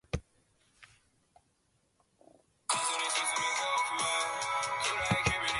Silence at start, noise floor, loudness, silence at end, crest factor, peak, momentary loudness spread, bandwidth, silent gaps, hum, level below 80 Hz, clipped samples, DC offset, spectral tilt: 0.15 s; -74 dBFS; -31 LUFS; 0 s; 22 dB; -12 dBFS; 4 LU; 12 kHz; none; none; -54 dBFS; under 0.1%; under 0.1%; -2 dB/octave